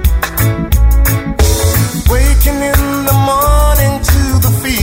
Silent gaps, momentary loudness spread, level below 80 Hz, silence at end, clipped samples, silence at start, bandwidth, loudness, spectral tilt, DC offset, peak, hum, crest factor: none; 3 LU; -12 dBFS; 0 s; under 0.1%; 0 s; 16.5 kHz; -11 LUFS; -5 dB/octave; under 0.1%; 0 dBFS; none; 10 dB